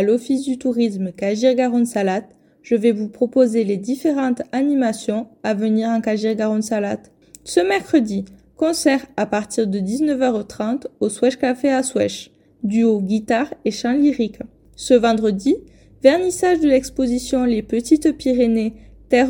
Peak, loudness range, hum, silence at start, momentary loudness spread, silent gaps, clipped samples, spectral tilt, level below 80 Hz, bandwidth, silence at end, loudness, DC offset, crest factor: 0 dBFS; 3 LU; none; 0 s; 8 LU; none; under 0.1%; -5 dB/octave; -50 dBFS; 17.5 kHz; 0 s; -19 LUFS; under 0.1%; 18 dB